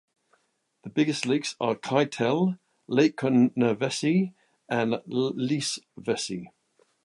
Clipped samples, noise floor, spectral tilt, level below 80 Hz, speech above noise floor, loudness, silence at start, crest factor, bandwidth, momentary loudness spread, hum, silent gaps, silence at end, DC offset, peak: under 0.1%; -71 dBFS; -5.5 dB/octave; -72 dBFS; 46 dB; -26 LUFS; 0.85 s; 20 dB; 11.5 kHz; 10 LU; none; none; 0.55 s; under 0.1%; -8 dBFS